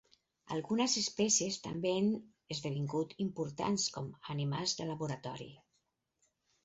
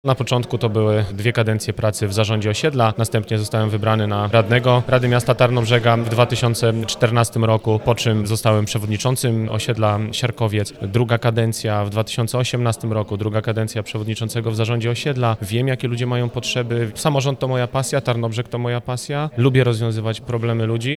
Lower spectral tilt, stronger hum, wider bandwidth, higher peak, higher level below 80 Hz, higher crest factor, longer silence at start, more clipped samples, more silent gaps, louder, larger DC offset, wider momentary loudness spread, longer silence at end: about the same, -5 dB/octave vs -5.5 dB/octave; neither; second, 8 kHz vs 14 kHz; second, -18 dBFS vs 0 dBFS; second, -72 dBFS vs -48 dBFS; about the same, 18 dB vs 18 dB; first, 0.45 s vs 0.05 s; neither; neither; second, -35 LUFS vs -19 LUFS; neither; first, 12 LU vs 7 LU; first, 1.1 s vs 0.05 s